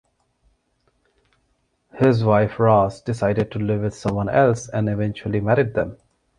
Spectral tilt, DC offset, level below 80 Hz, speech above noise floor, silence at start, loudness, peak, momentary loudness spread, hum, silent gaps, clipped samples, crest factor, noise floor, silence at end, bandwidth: -7.5 dB/octave; under 0.1%; -48 dBFS; 49 dB; 1.95 s; -20 LUFS; -2 dBFS; 8 LU; none; none; under 0.1%; 18 dB; -68 dBFS; 0.45 s; 10 kHz